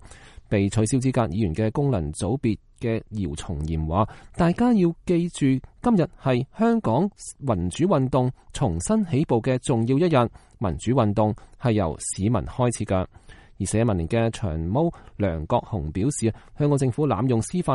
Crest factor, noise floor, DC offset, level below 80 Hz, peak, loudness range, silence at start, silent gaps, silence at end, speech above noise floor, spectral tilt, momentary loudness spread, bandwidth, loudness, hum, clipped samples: 16 dB; -45 dBFS; under 0.1%; -42 dBFS; -6 dBFS; 3 LU; 0.1 s; none; 0 s; 23 dB; -7 dB/octave; 7 LU; 11.5 kHz; -24 LUFS; none; under 0.1%